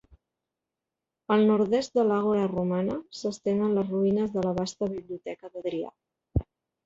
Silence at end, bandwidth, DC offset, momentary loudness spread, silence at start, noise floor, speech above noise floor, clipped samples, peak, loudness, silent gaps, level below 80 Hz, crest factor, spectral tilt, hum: 0.45 s; 7.8 kHz; under 0.1%; 13 LU; 1.3 s; -88 dBFS; 62 dB; under 0.1%; -10 dBFS; -27 LUFS; none; -48 dBFS; 16 dB; -7 dB/octave; none